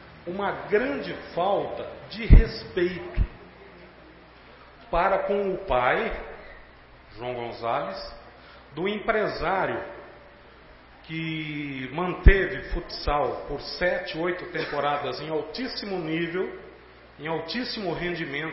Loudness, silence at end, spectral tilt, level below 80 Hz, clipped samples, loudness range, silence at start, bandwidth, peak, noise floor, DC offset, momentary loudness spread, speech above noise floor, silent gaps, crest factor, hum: -27 LUFS; 0 s; -10 dB/octave; -30 dBFS; under 0.1%; 5 LU; 0 s; 5.8 kHz; -2 dBFS; -50 dBFS; under 0.1%; 18 LU; 25 dB; none; 24 dB; none